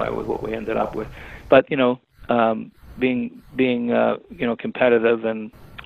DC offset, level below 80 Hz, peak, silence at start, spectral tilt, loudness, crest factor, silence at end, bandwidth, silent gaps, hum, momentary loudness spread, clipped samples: under 0.1%; -48 dBFS; 0 dBFS; 0 s; -7.5 dB/octave; -21 LUFS; 20 dB; 0 s; 6.2 kHz; none; none; 15 LU; under 0.1%